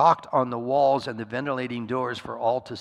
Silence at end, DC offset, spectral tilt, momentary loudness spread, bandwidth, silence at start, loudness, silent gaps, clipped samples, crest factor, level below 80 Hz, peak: 0 s; under 0.1%; -6.5 dB/octave; 9 LU; 11 kHz; 0 s; -26 LUFS; none; under 0.1%; 18 dB; -64 dBFS; -6 dBFS